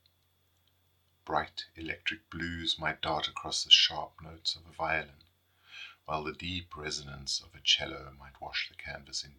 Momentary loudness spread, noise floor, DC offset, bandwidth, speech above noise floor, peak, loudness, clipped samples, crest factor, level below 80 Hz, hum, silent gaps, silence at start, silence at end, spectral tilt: 20 LU; -72 dBFS; under 0.1%; 18 kHz; 38 dB; -6 dBFS; -31 LUFS; under 0.1%; 28 dB; -60 dBFS; none; none; 1.25 s; 0.1 s; -1.5 dB/octave